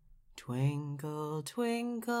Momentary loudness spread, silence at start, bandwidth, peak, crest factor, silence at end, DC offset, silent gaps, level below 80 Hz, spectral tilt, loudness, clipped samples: 9 LU; 0.1 s; 16 kHz; -20 dBFS; 16 dB; 0 s; under 0.1%; none; -68 dBFS; -6.5 dB/octave; -36 LUFS; under 0.1%